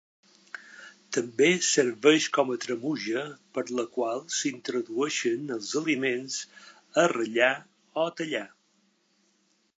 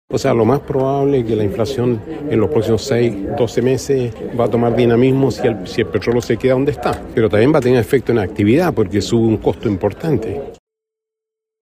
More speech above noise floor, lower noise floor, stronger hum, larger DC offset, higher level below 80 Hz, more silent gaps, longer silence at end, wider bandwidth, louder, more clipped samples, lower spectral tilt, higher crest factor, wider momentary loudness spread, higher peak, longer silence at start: second, 42 dB vs 68 dB; second, -69 dBFS vs -83 dBFS; neither; neither; second, -84 dBFS vs -40 dBFS; neither; about the same, 1.3 s vs 1.2 s; second, 9.4 kHz vs 15.5 kHz; second, -27 LUFS vs -16 LUFS; neither; second, -3 dB/octave vs -7 dB/octave; first, 22 dB vs 14 dB; first, 15 LU vs 6 LU; second, -6 dBFS vs -2 dBFS; first, 0.55 s vs 0.1 s